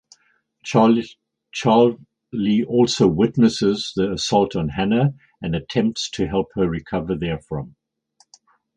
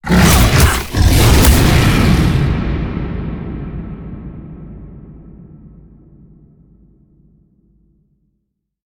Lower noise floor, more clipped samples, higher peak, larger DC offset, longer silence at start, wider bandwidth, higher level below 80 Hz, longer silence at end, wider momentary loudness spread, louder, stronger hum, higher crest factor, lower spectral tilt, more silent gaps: second, -64 dBFS vs -70 dBFS; neither; about the same, 0 dBFS vs 0 dBFS; neither; first, 0.65 s vs 0.05 s; second, 9.6 kHz vs over 20 kHz; second, -46 dBFS vs -20 dBFS; second, 1.1 s vs 3.2 s; second, 15 LU vs 23 LU; second, -20 LUFS vs -13 LUFS; neither; first, 20 dB vs 14 dB; about the same, -6 dB/octave vs -5 dB/octave; neither